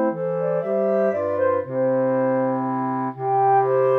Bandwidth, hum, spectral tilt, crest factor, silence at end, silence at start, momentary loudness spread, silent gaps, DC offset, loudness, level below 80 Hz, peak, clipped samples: 3.5 kHz; 50 Hz at -60 dBFS; -10.5 dB/octave; 12 dB; 0 s; 0 s; 6 LU; none; under 0.1%; -21 LUFS; -80 dBFS; -8 dBFS; under 0.1%